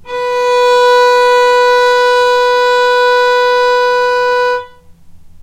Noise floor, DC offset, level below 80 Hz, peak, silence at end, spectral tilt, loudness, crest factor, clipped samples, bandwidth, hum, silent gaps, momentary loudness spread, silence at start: -36 dBFS; under 0.1%; -48 dBFS; -2 dBFS; 0 s; 0 dB/octave; -10 LUFS; 8 dB; under 0.1%; 14 kHz; none; none; 5 LU; 0.05 s